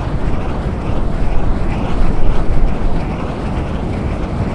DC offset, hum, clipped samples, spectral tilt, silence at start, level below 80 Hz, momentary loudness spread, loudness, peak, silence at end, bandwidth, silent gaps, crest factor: under 0.1%; none; under 0.1%; -8 dB/octave; 0 s; -18 dBFS; 2 LU; -20 LUFS; 0 dBFS; 0 s; 6 kHz; none; 12 dB